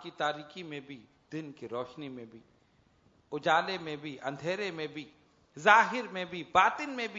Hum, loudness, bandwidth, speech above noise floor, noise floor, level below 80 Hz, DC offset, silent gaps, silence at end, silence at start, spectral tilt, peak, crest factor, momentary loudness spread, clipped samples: none; -30 LUFS; 7.4 kHz; 35 dB; -67 dBFS; -74 dBFS; under 0.1%; none; 0 s; 0 s; -1.5 dB/octave; -6 dBFS; 26 dB; 21 LU; under 0.1%